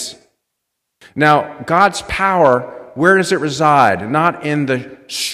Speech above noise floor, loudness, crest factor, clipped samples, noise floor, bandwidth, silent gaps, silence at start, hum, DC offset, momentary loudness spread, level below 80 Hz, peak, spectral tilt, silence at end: 61 dB; -14 LUFS; 16 dB; under 0.1%; -75 dBFS; 15 kHz; none; 0 s; none; under 0.1%; 10 LU; -46 dBFS; 0 dBFS; -4.5 dB/octave; 0 s